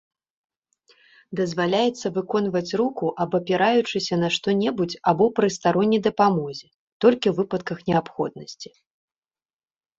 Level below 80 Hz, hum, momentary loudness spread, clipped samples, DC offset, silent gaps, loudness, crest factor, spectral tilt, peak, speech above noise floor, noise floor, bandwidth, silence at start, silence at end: -62 dBFS; none; 10 LU; under 0.1%; under 0.1%; 6.74-7.00 s; -22 LUFS; 20 dB; -5.5 dB/octave; -4 dBFS; over 68 dB; under -90 dBFS; 7.8 kHz; 1.3 s; 1.35 s